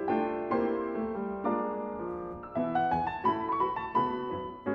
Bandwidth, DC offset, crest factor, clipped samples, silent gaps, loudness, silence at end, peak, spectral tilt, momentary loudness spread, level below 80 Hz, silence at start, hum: 6.4 kHz; under 0.1%; 16 dB; under 0.1%; none; -32 LUFS; 0 s; -16 dBFS; -9 dB/octave; 7 LU; -60 dBFS; 0 s; none